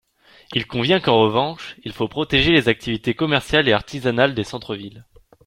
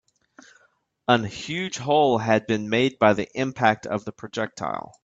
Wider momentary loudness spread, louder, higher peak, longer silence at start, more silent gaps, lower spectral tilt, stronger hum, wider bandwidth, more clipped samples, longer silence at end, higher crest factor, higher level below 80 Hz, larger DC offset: first, 15 LU vs 11 LU; first, -19 LUFS vs -23 LUFS; about the same, -2 dBFS vs -2 dBFS; second, 0.5 s vs 1.1 s; neither; about the same, -5.5 dB/octave vs -5 dB/octave; neither; first, 15 kHz vs 8 kHz; neither; first, 0.45 s vs 0.25 s; about the same, 18 dB vs 22 dB; first, -44 dBFS vs -62 dBFS; neither